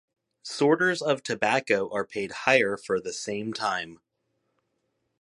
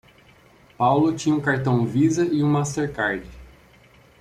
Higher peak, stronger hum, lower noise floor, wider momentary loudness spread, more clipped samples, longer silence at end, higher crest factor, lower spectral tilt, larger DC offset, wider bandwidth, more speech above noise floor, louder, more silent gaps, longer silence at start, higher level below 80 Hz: about the same, -6 dBFS vs -8 dBFS; neither; first, -77 dBFS vs -53 dBFS; first, 10 LU vs 6 LU; neither; first, 1.25 s vs 0.75 s; first, 22 dB vs 16 dB; second, -4 dB/octave vs -6.5 dB/octave; neither; about the same, 11.5 kHz vs 11.5 kHz; first, 51 dB vs 32 dB; second, -26 LUFS vs -22 LUFS; neither; second, 0.45 s vs 0.8 s; second, -70 dBFS vs -52 dBFS